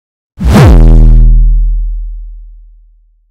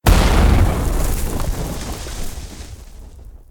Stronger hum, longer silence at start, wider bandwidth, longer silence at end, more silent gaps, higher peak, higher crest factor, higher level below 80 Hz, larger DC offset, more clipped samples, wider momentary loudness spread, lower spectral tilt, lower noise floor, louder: neither; first, 0.4 s vs 0.05 s; second, 8.6 kHz vs 18 kHz; first, 0.85 s vs 0.15 s; neither; about the same, 0 dBFS vs 0 dBFS; second, 6 dB vs 16 dB; first, -6 dBFS vs -20 dBFS; neither; first, 10% vs under 0.1%; second, 19 LU vs 23 LU; first, -7.5 dB/octave vs -5.5 dB/octave; first, -43 dBFS vs -37 dBFS; first, -7 LUFS vs -19 LUFS